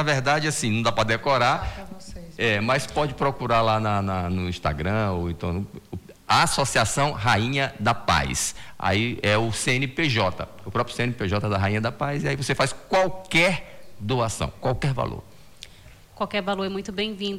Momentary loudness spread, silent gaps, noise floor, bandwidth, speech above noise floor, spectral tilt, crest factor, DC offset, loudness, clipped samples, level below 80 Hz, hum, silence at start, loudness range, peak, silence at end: 10 LU; none; -48 dBFS; 16.5 kHz; 25 dB; -4.5 dB/octave; 16 dB; under 0.1%; -24 LUFS; under 0.1%; -46 dBFS; none; 0 s; 3 LU; -8 dBFS; 0 s